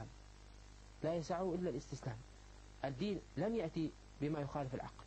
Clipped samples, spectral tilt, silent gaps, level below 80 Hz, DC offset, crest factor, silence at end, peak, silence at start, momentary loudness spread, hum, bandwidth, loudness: under 0.1%; -7 dB/octave; none; -60 dBFS; under 0.1%; 16 dB; 0 s; -26 dBFS; 0 s; 20 LU; 50 Hz at -60 dBFS; 8.8 kHz; -42 LUFS